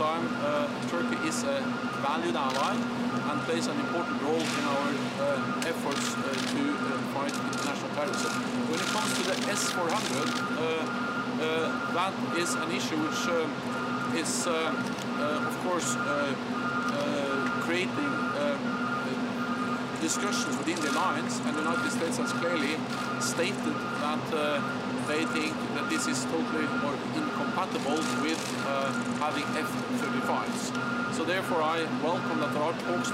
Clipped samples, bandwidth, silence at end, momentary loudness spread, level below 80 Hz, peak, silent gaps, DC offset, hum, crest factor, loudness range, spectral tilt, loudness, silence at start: under 0.1%; 16 kHz; 0 s; 3 LU; -68 dBFS; -14 dBFS; none; under 0.1%; none; 16 dB; 1 LU; -4 dB/octave; -29 LUFS; 0 s